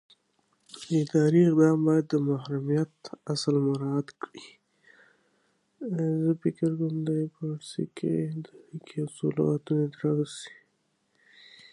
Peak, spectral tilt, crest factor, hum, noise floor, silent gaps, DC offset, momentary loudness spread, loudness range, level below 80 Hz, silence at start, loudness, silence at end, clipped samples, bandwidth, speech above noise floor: -10 dBFS; -7.5 dB/octave; 18 dB; none; -73 dBFS; none; under 0.1%; 20 LU; 7 LU; -74 dBFS; 0.75 s; -27 LUFS; 1.2 s; under 0.1%; 11 kHz; 46 dB